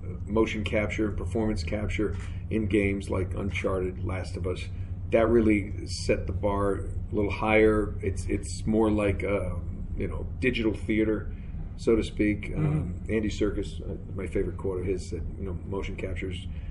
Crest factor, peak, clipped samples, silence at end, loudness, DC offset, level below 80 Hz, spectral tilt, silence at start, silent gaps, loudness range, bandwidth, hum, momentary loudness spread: 20 dB; -8 dBFS; under 0.1%; 0 s; -29 LUFS; under 0.1%; -36 dBFS; -7 dB/octave; 0 s; none; 4 LU; 11.5 kHz; none; 11 LU